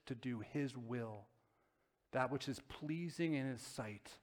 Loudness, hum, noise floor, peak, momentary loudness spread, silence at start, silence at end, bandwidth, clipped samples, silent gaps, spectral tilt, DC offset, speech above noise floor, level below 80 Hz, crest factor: -44 LUFS; none; -81 dBFS; -22 dBFS; 8 LU; 0.05 s; 0.05 s; 19 kHz; under 0.1%; none; -6 dB/octave; under 0.1%; 38 dB; -74 dBFS; 22 dB